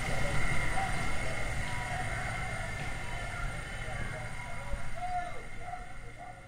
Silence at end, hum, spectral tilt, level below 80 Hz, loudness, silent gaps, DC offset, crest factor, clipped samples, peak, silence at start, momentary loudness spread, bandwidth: 0 s; none; -4.5 dB/octave; -40 dBFS; -37 LUFS; none; under 0.1%; 16 dB; under 0.1%; -16 dBFS; 0 s; 11 LU; 14.5 kHz